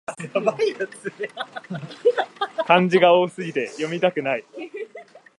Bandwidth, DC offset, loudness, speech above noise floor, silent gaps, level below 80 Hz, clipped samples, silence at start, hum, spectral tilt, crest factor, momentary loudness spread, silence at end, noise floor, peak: 11.5 kHz; under 0.1%; -22 LUFS; 23 dB; none; -74 dBFS; under 0.1%; 0.1 s; none; -5.5 dB/octave; 20 dB; 18 LU; 0.2 s; -44 dBFS; -2 dBFS